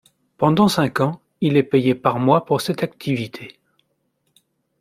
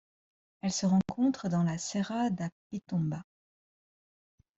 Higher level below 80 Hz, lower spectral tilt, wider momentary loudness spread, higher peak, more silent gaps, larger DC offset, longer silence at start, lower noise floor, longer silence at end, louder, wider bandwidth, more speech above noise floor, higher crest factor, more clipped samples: first, -58 dBFS vs -68 dBFS; about the same, -6.5 dB/octave vs -6 dB/octave; about the same, 9 LU vs 10 LU; first, -2 dBFS vs -18 dBFS; second, none vs 2.52-2.70 s; neither; second, 0.4 s vs 0.65 s; second, -69 dBFS vs under -90 dBFS; about the same, 1.3 s vs 1.35 s; first, -19 LUFS vs -31 LUFS; first, 16 kHz vs 8 kHz; second, 51 dB vs over 59 dB; about the same, 18 dB vs 16 dB; neither